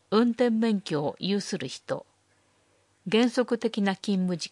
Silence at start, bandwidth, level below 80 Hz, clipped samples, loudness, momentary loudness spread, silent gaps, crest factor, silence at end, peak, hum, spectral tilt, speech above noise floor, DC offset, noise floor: 0.1 s; 11.5 kHz; -76 dBFS; under 0.1%; -27 LUFS; 11 LU; none; 18 dB; 0.05 s; -10 dBFS; 50 Hz at -65 dBFS; -5.5 dB/octave; 40 dB; under 0.1%; -67 dBFS